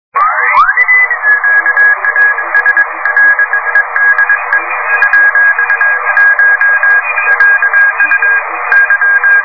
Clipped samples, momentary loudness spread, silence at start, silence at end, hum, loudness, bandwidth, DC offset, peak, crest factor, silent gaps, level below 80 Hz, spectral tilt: 0.4%; 4 LU; 0.15 s; 0 s; none; -7 LUFS; 5.4 kHz; 1%; 0 dBFS; 8 dB; none; -52 dBFS; -2.5 dB/octave